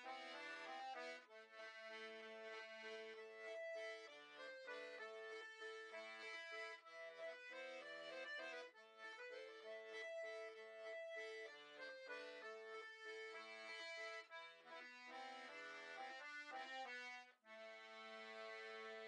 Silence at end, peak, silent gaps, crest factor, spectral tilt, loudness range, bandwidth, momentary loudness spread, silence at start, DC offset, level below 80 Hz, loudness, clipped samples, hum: 0 s; -42 dBFS; none; 14 dB; -0.5 dB/octave; 1 LU; 10 kHz; 6 LU; 0 s; under 0.1%; under -90 dBFS; -54 LUFS; under 0.1%; none